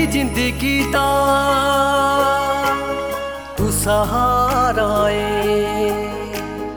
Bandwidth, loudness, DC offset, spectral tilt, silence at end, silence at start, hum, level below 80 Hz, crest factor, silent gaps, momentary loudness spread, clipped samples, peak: over 20 kHz; -18 LUFS; under 0.1%; -4.5 dB/octave; 0 s; 0 s; none; -32 dBFS; 14 dB; none; 9 LU; under 0.1%; -4 dBFS